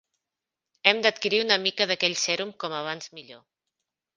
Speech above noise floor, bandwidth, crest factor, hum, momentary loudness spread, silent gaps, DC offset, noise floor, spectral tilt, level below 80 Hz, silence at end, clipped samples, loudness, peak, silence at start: 61 dB; 10 kHz; 26 dB; none; 14 LU; none; under 0.1%; -88 dBFS; -1.5 dB/octave; -76 dBFS; 0.8 s; under 0.1%; -24 LUFS; -2 dBFS; 0.85 s